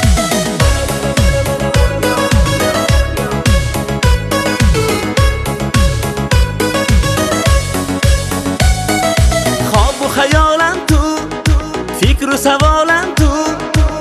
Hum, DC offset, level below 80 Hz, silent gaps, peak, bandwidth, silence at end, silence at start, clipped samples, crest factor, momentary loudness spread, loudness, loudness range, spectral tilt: none; under 0.1%; -16 dBFS; none; 0 dBFS; 14.5 kHz; 0 s; 0 s; under 0.1%; 12 dB; 4 LU; -13 LUFS; 1 LU; -4.5 dB/octave